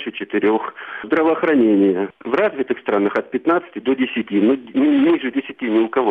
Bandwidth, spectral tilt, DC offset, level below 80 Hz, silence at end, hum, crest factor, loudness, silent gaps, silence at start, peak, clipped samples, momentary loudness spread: 4.6 kHz; -8 dB/octave; under 0.1%; -62 dBFS; 0 s; none; 14 dB; -18 LUFS; none; 0 s; -4 dBFS; under 0.1%; 8 LU